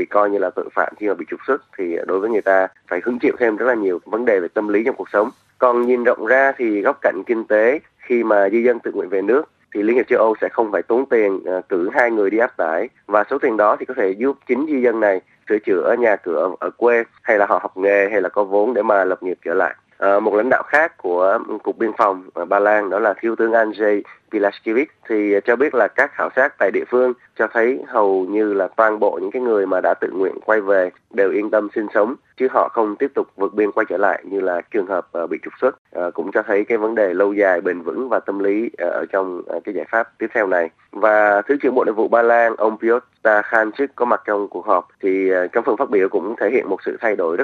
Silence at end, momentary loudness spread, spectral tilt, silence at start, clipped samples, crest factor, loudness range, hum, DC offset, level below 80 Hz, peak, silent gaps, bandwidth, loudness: 0 s; 7 LU; -7 dB/octave; 0 s; under 0.1%; 18 dB; 3 LU; none; under 0.1%; -70 dBFS; 0 dBFS; 35.78-35.85 s; 6.8 kHz; -18 LUFS